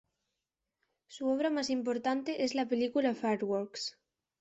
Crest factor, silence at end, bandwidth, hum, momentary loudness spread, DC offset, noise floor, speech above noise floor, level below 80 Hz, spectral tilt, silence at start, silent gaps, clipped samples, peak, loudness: 16 dB; 0.5 s; 8.2 kHz; none; 8 LU; under 0.1%; -88 dBFS; 56 dB; -78 dBFS; -4.5 dB/octave; 1.1 s; none; under 0.1%; -18 dBFS; -33 LUFS